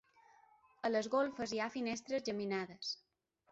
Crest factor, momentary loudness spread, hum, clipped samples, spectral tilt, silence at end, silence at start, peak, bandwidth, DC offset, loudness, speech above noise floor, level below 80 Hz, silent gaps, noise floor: 18 dB; 8 LU; none; under 0.1%; -3 dB/octave; 0.55 s; 0.85 s; -24 dBFS; 8 kHz; under 0.1%; -39 LUFS; 30 dB; -78 dBFS; none; -68 dBFS